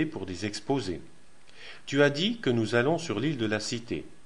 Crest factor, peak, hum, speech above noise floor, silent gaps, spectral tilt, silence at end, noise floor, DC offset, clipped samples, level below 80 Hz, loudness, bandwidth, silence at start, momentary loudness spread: 20 dB; -10 dBFS; none; 25 dB; none; -5 dB/octave; 0.15 s; -53 dBFS; 0.6%; under 0.1%; -58 dBFS; -28 LUFS; 11.5 kHz; 0 s; 15 LU